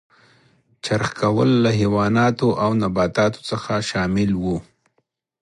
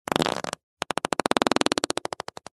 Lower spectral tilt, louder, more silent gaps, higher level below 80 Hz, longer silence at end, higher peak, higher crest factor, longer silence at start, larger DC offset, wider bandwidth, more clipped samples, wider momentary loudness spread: first, -6.5 dB/octave vs -3 dB/octave; first, -20 LUFS vs -26 LUFS; second, none vs 0.63-0.77 s; first, -46 dBFS vs -62 dBFS; about the same, 0.8 s vs 0.7 s; second, -6 dBFS vs 0 dBFS; second, 16 dB vs 26 dB; first, 0.85 s vs 0.1 s; neither; about the same, 11.5 kHz vs 12.5 kHz; neither; second, 7 LU vs 12 LU